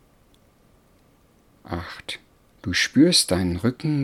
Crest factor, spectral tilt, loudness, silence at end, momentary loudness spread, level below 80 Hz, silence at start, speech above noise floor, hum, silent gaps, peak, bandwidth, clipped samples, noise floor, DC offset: 20 dB; -4 dB/octave; -21 LUFS; 0 s; 19 LU; -50 dBFS; 1.7 s; 37 dB; none; none; -4 dBFS; 15.5 kHz; under 0.1%; -58 dBFS; under 0.1%